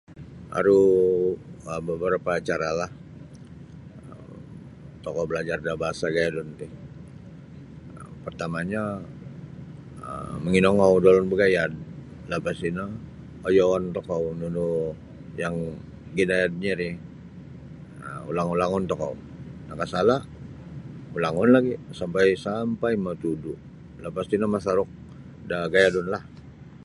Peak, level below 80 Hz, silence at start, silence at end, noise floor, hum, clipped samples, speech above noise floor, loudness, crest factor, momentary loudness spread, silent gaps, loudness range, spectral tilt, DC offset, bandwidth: -4 dBFS; -52 dBFS; 0.1 s; 0.05 s; -44 dBFS; none; under 0.1%; 21 dB; -24 LUFS; 22 dB; 24 LU; none; 9 LU; -6.5 dB/octave; under 0.1%; 11.5 kHz